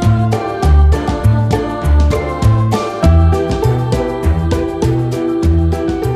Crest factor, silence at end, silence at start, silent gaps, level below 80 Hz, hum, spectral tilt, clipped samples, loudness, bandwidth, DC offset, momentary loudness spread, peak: 12 dB; 0 s; 0 s; none; -16 dBFS; none; -7.5 dB/octave; under 0.1%; -14 LUFS; 13 kHz; under 0.1%; 5 LU; 0 dBFS